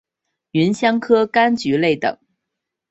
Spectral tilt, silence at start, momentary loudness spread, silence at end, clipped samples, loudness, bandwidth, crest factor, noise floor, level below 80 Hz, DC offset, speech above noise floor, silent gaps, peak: -6 dB/octave; 0.55 s; 7 LU; 0.75 s; under 0.1%; -17 LUFS; 8.2 kHz; 16 dB; -81 dBFS; -60 dBFS; under 0.1%; 64 dB; none; -2 dBFS